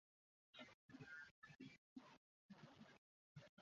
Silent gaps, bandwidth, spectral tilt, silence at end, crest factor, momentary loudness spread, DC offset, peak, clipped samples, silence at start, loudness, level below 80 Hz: 0.74-0.89 s, 1.31-1.42 s, 1.78-1.96 s, 2.17-2.49 s, 2.98-3.35 s, 3.49-3.57 s; 7.2 kHz; -3.5 dB/octave; 0 s; 18 dB; 8 LU; under 0.1%; -46 dBFS; under 0.1%; 0.55 s; -64 LUFS; under -90 dBFS